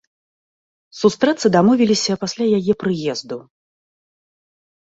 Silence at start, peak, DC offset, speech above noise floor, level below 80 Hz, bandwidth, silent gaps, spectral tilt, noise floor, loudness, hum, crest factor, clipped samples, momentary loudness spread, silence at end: 0.95 s; -2 dBFS; under 0.1%; over 73 dB; -60 dBFS; 8 kHz; none; -5 dB/octave; under -90 dBFS; -17 LUFS; none; 18 dB; under 0.1%; 12 LU; 1.45 s